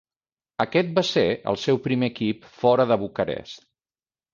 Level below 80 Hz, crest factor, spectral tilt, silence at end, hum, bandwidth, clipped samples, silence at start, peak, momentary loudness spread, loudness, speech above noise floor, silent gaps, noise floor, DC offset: -58 dBFS; 18 dB; -6 dB/octave; 0.75 s; none; 7.6 kHz; under 0.1%; 0.6 s; -6 dBFS; 12 LU; -23 LUFS; over 67 dB; none; under -90 dBFS; under 0.1%